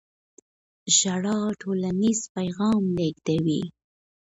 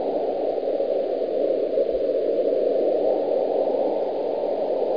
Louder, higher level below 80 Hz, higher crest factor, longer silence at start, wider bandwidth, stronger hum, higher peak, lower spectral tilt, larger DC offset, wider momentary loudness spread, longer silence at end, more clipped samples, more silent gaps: about the same, -24 LUFS vs -23 LUFS; about the same, -60 dBFS vs -60 dBFS; first, 18 dB vs 12 dB; first, 0.85 s vs 0 s; first, 8.2 kHz vs 5.2 kHz; neither; first, -6 dBFS vs -10 dBFS; second, -4 dB/octave vs -8 dB/octave; second, under 0.1% vs 0.4%; first, 10 LU vs 3 LU; first, 0.6 s vs 0 s; neither; first, 2.29-2.35 s vs none